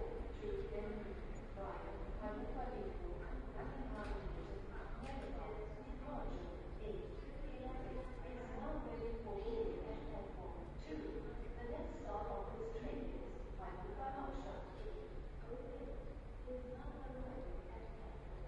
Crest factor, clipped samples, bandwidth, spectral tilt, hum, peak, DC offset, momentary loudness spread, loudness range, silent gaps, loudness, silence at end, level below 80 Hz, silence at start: 16 dB; under 0.1%; 9.2 kHz; -8 dB/octave; none; -30 dBFS; under 0.1%; 5 LU; 3 LU; none; -49 LUFS; 0 s; -50 dBFS; 0 s